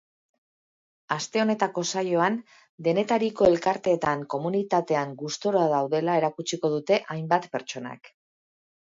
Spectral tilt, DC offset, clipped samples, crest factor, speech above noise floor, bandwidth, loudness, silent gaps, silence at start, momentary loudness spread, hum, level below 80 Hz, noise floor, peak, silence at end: -5 dB/octave; under 0.1%; under 0.1%; 20 dB; over 65 dB; 7.8 kHz; -25 LUFS; 2.69-2.78 s; 1.1 s; 10 LU; none; -64 dBFS; under -90 dBFS; -6 dBFS; 0.75 s